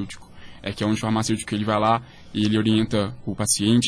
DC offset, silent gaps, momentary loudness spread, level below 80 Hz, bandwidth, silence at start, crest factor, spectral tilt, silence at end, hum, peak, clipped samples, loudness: under 0.1%; none; 12 LU; -48 dBFS; 11 kHz; 0 s; 16 dB; -4.5 dB/octave; 0 s; none; -6 dBFS; under 0.1%; -23 LUFS